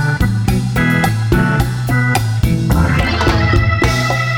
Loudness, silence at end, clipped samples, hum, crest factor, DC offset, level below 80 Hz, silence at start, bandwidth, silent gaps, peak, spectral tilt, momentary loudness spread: -14 LUFS; 0 s; under 0.1%; none; 12 dB; under 0.1%; -22 dBFS; 0 s; 18 kHz; none; 0 dBFS; -6 dB/octave; 3 LU